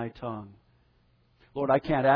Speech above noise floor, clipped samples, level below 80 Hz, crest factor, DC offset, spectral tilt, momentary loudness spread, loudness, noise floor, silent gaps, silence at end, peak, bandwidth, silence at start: 39 dB; under 0.1%; -54 dBFS; 18 dB; under 0.1%; -9.5 dB/octave; 17 LU; -29 LUFS; -65 dBFS; none; 0 s; -10 dBFS; 5.4 kHz; 0 s